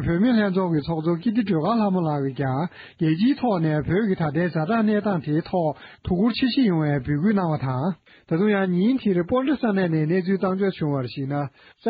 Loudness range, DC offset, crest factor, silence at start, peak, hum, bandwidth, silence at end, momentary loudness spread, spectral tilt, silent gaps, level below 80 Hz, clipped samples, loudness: 1 LU; under 0.1%; 12 dB; 0 s; -10 dBFS; none; 5.2 kHz; 0 s; 7 LU; -6.5 dB/octave; none; -50 dBFS; under 0.1%; -23 LUFS